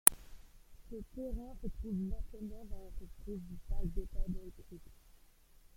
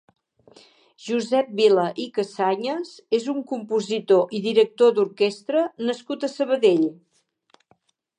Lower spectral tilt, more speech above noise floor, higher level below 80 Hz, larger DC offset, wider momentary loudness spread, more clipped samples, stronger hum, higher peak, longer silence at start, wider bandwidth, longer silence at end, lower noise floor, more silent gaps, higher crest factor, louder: second, -3.5 dB/octave vs -5 dB/octave; second, 23 dB vs 43 dB; first, -44 dBFS vs -80 dBFS; neither; first, 15 LU vs 9 LU; neither; neither; first, 0 dBFS vs -6 dBFS; second, 0.05 s vs 1 s; first, 16.5 kHz vs 10 kHz; second, 0.65 s vs 1.25 s; about the same, -62 dBFS vs -64 dBFS; neither; first, 38 dB vs 18 dB; second, -42 LUFS vs -22 LUFS